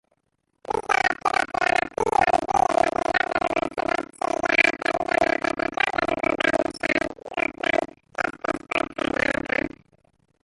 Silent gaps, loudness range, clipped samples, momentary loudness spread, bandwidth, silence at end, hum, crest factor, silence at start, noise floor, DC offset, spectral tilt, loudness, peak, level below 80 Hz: none; 4 LU; under 0.1%; 7 LU; 11.5 kHz; 0.75 s; none; 20 dB; 0.7 s; -74 dBFS; under 0.1%; -3.5 dB/octave; -23 LUFS; -4 dBFS; -52 dBFS